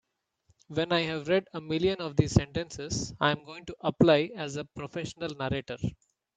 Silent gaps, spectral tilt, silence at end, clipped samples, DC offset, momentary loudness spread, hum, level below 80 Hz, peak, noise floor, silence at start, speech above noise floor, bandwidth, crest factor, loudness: none; -5.5 dB/octave; 0.45 s; under 0.1%; under 0.1%; 12 LU; none; -52 dBFS; -6 dBFS; -70 dBFS; 0.7 s; 41 dB; 9.4 kHz; 24 dB; -29 LUFS